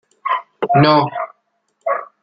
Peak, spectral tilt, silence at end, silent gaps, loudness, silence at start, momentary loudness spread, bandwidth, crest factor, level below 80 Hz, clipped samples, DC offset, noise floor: 0 dBFS; -8.5 dB/octave; 0.2 s; none; -17 LUFS; 0.25 s; 15 LU; 5.8 kHz; 18 dB; -60 dBFS; under 0.1%; under 0.1%; -66 dBFS